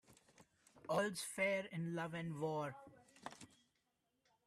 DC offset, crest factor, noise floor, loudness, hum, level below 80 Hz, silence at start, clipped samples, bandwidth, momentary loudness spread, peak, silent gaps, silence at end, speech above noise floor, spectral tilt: under 0.1%; 20 dB; -85 dBFS; -42 LUFS; none; -84 dBFS; 0.1 s; under 0.1%; 14 kHz; 21 LU; -26 dBFS; none; 1 s; 43 dB; -5 dB/octave